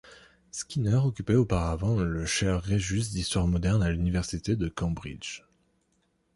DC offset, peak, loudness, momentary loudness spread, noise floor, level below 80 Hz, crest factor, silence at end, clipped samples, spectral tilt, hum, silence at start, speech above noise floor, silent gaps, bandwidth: under 0.1%; -12 dBFS; -28 LUFS; 12 LU; -72 dBFS; -40 dBFS; 16 dB; 0.95 s; under 0.1%; -5.5 dB/octave; none; 0.05 s; 45 dB; none; 11.5 kHz